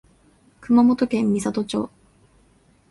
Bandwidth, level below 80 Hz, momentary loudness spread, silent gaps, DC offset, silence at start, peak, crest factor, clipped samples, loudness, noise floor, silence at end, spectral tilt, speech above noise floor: 11.5 kHz; -56 dBFS; 11 LU; none; under 0.1%; 0.6 s; -6 dBFS; 16 dB; under 0.1%; -20 LUFS; -58 dBFS; 1.05 s; -6 dB/octave; 38 dB